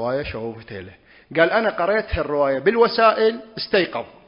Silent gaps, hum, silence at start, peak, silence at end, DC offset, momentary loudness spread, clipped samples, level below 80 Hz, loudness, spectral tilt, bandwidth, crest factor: none; none; 0 s; 0 dBFS; 0.2 s; under 0.1%; 15 LU; under 0.1%; -42 dBFS; -20 LUFS; -9.5 dB/octave; 5.4 kHz; 20 dB